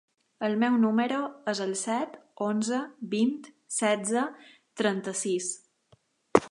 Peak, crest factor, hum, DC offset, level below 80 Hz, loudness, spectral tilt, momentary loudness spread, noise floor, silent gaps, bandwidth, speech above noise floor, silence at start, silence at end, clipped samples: -2 dBFS; 26 dB; none; under 0.1%; -68 dBFS; -29 LUFS; -4 dB/octave; 9 LU; -65 dBFS; none; 11.5 kHz; 37 dB; 0.4 s; 0 s; under 0.1%